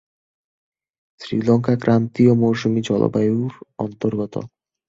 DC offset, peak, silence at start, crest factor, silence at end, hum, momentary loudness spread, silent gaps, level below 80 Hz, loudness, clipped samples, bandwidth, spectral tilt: under 0.1%; -2 dBFS; 1.2 s; 18 dB; 0.4 s; none; 14 LU; none; -56 dBFS; -19 LUFS; under 0.1%; 7.6 kHz; -8 dB/octave